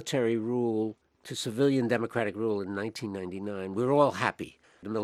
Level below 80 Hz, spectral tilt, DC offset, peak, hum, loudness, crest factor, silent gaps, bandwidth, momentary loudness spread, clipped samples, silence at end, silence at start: -72 dBFS; -5.5 dB/octave; under 0.1%; -8 dBFS; none; -30 LUFS; 20 dB; none; 15 kHz; 13 LU; under 0.1%; 0 s; 0 s